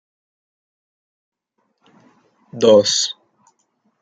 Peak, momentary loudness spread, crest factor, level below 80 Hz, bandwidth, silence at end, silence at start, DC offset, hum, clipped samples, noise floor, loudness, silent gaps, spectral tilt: -2 dBFS; 25 LU; 20 dB; -68 dBFS; 9.2 kHz; 0.9 s; 2.55 s; under 0.1%; none; under 0.1%; -70 dBFS; -15 LUFS; none; -3 dB/octave